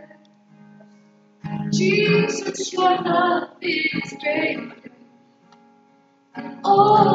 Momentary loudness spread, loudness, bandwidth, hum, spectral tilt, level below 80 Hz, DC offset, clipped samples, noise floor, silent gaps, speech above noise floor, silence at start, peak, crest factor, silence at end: 18 LU; -20 LUFS; 8 kHz; none; -5 dB/octave; -68 dBFS; under 0.1%; under 0.1%; -57 dBFS; none; 38 dB; 0 s; -2 dBFS; 20 dB; 0 s